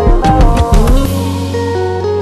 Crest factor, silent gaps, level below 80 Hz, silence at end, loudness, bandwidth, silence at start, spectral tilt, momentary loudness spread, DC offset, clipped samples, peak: 10 dB; none; -12 dBFS; 0 s; -12 LUFS; 13.5 kHz; 0 s; -6.5 dB/octave; 6 LU; under 0.1%; under 0.1%; 0 dBFS